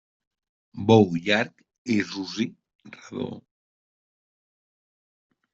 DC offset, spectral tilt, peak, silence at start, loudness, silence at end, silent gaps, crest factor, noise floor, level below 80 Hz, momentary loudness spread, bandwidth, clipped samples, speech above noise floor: under 0.1%; -6 dB/octave; -4 dBFS; 0.75 s; -24 LUFS; 2.15 s; 1.78-1.85 s, 2.75-2.79 s; 24 dB; under -90 dBFS; -66 dBFS; 20 LU; 7.8 kHz; under 0.1%; over 66 dB